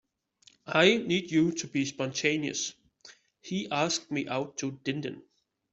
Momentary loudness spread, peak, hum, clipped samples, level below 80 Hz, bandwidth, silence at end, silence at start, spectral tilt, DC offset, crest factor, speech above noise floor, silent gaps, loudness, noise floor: 13 LU; -8 dBFS; none; under 0.1%; -70 dBFS; 8.2 kHz; 0.5 s; 0.65 s; -4 dB/octave; under 0.1%; 22 dB; 34 dB; none; -29 LUFS; -63 dBFS